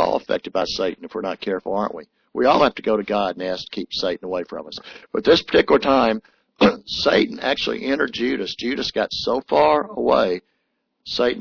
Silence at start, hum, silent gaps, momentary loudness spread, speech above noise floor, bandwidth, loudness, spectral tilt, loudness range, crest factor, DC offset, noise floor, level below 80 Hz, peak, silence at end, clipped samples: 0 s; none; none; 12 LU; 52 dB; 5.4 kHz; -21 LUFS; -5 dB/octave; 3 LU; 16 dB; under 0.1%; -72 dBFS; -52 dBFS; -6 dBFS; 0 s; under 0.1%